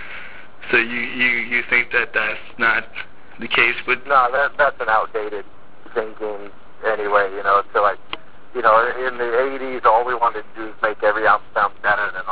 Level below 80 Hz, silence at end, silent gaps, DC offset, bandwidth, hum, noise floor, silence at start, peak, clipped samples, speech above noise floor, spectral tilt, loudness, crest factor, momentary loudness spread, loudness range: -54 dBFS; 0 s; none; 3%; 4 kHz; none; -38 dBFS; 0 s; -2 dBFS; under 0.1%; 19 dB; -6.5 dB/octave; -18 LUFS; 18 dB; 17 LU; 3 LU